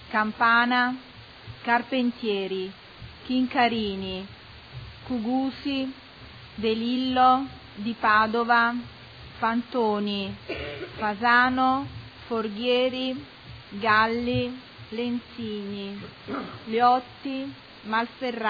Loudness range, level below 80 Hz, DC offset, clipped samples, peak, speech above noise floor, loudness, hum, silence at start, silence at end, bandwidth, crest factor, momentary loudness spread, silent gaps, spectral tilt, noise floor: 5 LU; -54 dBFS; under 0.1%; under 0.1%; -8 dBFS; 20 dB; -25 LUFS; none; 0 s; 0 s; 5 kHz; 18 dB; 22 LU; none; -7 dB/octave; -45 dBFS